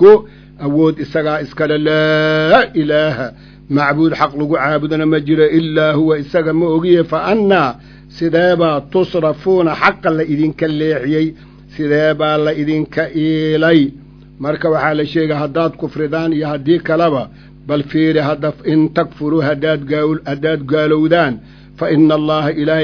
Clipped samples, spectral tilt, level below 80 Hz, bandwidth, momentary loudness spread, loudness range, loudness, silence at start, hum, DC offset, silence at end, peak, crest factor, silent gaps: 0.2%; -8 dB/octave; -44 dBFS; 5.4 kHz; 7 LU; 2 LU; -14 LUFS; 0 s; none; under 0.1%; 0 s; 0 dBFS; 14 dB; none